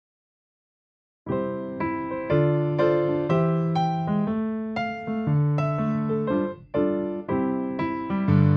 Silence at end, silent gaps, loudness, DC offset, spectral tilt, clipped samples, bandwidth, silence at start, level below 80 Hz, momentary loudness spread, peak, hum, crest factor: 0 s; none; -25 LUFS; under 0.1%; -10 dB/octave; under 0.1%; 6 kHz; 1.25 s; -56 dBFS; 7 LU; -10 dBFS; none; 16 dB